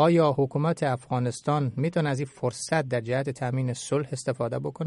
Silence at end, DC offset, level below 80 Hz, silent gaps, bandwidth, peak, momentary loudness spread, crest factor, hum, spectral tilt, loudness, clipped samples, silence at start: 0 s; under 0.1%; -64 dBFS; none; 11.5 kHz; -8 dBFS; 5 LU; 18 dB; none; -6.5 dB/octave; -27 LUFS; under 0.1%; 0 s